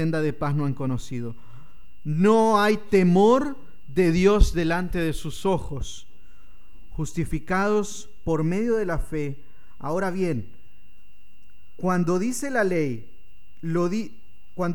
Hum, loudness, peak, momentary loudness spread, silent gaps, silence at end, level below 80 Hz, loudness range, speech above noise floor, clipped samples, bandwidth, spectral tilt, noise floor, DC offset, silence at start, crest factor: none; -24 LUFS; -6 dBFS; 17 LU; none; 0 s; -34 dBFS; 8 LU; 36 dB; under 0.1%; 17.5 kHz; -6.5 dB/octave; -58 dBFS; 3%; 0 s; 18 dB